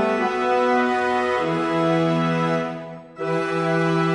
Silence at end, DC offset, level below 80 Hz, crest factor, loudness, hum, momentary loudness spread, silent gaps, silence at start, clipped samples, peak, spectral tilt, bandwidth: 0 s; under 0.1%; -58 dBFS; 12 dB; -21 LUFS; none; 8 LU; none; 0 s; under 0.1%; -8 dBFS; -6.5 dB/octave; 10.5 kHz